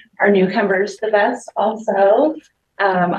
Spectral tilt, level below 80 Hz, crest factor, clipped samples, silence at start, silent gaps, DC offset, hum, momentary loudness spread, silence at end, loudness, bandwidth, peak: -6.5 dB/octave; -68 dBFS; 16 dB; under 0.1%; 0.2 s; none; under 0.1%; none; 6 LU; 0 s; -17 LUFS; 9.6 kHz; -2 dBFS